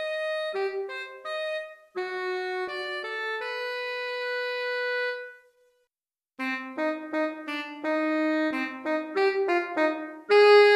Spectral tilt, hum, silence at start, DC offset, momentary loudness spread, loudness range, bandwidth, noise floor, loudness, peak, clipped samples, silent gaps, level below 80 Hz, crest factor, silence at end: -2.5 dB/octave; none; 0 s; under 0.1%; 9 LU; 5 LU; 11.5 kHz; under -90 dBFS; -28 LUFS; -8 dBFS; under 0.1%; none; -84 dBFS; 18 dB; 0 s